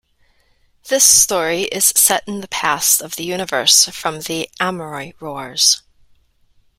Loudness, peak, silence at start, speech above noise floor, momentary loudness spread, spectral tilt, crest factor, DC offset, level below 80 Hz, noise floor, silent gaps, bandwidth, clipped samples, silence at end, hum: -14 LUFS; 0 dBFS; 0.85 s; 41 dB; 15 LU; -0.5 dB/octave; 18 dB; under 0.1%; -54 dBFS; -57 dBFS; none; 19.5 kHz; under 0.1%; 1 s; none